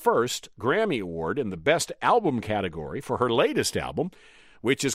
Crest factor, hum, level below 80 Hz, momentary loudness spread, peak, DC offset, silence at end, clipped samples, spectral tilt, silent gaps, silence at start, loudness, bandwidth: 18 dB; none; -54 dBFS; 9 LU; -8 dBFS; under 0.1%; 0 s; under 0.1%; -4 dB/octave; none; 0 s; -26 LUFS; 16 kHz